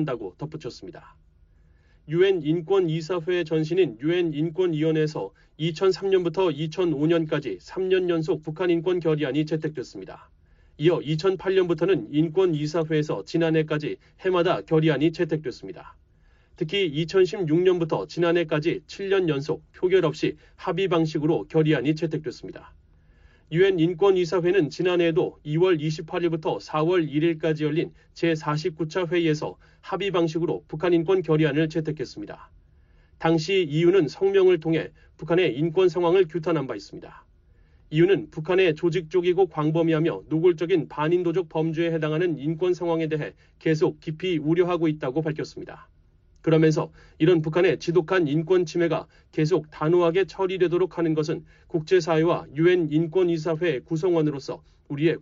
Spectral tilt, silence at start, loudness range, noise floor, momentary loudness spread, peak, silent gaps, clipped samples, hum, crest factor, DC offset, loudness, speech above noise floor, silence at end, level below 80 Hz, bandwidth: -6 dB/octave; 0 s; 3 LU; -58 dBFS; 11 LU; -8 dBFS; none; under 0.1%; none; 16 dB; under 0.1%; -24 LUFS; 35 dB; 0 s; -58 dBFS; 7.4 kHz